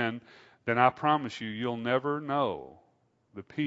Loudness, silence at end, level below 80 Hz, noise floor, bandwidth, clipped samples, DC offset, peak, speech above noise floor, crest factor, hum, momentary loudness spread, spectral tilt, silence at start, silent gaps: -29 LUFS; 0 s; -72 dBFS; -69 dBFS; 8 kHz; under 0.1%; under 0.1%; -6 dBFS; 40 dB; 24 dB; none; 17 LU; -6.5 dB/octave; 0 s; none